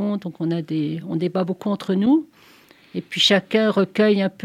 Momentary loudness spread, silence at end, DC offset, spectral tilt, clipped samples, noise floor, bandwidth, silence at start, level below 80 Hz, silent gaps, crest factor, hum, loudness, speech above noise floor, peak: 9 LU; 0 s; under 0.1%; -5.5 dB/octave; under 0.1%; -51 dBFS; 14 kHz; 0 s; -70 dBFS; none; 18 dB; none; -20 LUFS; 31 dB; -4 dBFS